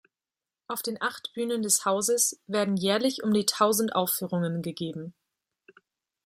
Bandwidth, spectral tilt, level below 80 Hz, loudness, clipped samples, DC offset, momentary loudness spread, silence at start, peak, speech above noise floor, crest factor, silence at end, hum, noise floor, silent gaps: 16 kHz; -3.5 dB/octave; -74 dBFS; -27 LUFS; under 0.1%; under 0.1%; 11 LU; 0.7 s; -8 dBFS; over 63 dB; 20 dB; 1.15 s; none; under -90 dBFS; none